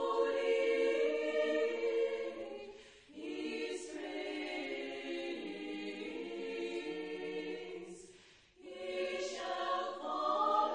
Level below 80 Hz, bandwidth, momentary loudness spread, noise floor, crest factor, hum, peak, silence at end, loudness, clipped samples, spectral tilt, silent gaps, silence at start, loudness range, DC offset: -78 dBFS; 10 kHz; 16 LU; -62 dBFS; 18 dB; none; -20 dBFS; 0 s; -38 LUFS; under 0.1%; -3 dB/octave; none; 0 s; 7 LU; under 0.1%